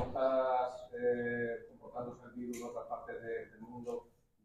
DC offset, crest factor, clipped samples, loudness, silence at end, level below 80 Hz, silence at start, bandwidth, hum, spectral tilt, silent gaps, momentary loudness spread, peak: under 0.1%; 18 dB; under 0.1%; -39 LUFS; 0.4 s; -66 dBFS; 0 s; 14 kHz; none; -6 dB/octave; none; 14 LU; -20 dBFS